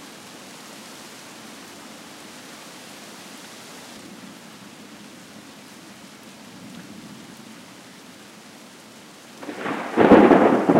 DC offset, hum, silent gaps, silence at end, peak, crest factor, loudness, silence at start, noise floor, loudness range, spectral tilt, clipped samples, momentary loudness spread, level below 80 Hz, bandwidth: under 0.1%; none; none; 0 s; -2 dBFS; 22 dB; -16 LUFS; 9.4 s; -45 dBFS; 20 LU; -6 dB/octave; under 0.1%; 27 LU; -56 dBFS; 16 kHz